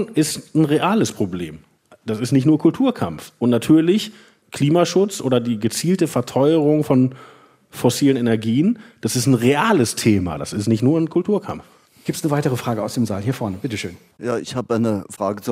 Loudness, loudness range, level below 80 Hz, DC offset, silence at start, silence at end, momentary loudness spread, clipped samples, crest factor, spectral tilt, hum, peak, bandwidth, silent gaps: -19 LUFS; 5 LU; -58 dBFS; under 0.1%; 0 s; 0 s; 11 LU; under 0.1%; 16 dB; -6 dB/octave; none; -4 dBFS; 16 kHz; none